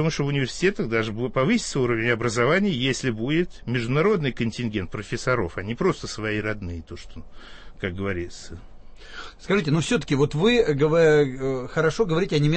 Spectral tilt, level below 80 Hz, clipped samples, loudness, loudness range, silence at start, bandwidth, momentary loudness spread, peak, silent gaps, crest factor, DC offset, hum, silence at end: -5.5 dB/octave; -42 dBFS; under 0.1%; -23 LUFS; 8 LU; 0 s; 8.8 kHz; 14 LU; -8 dBFS; none; 16 dB; under 0.1%; none; 0 s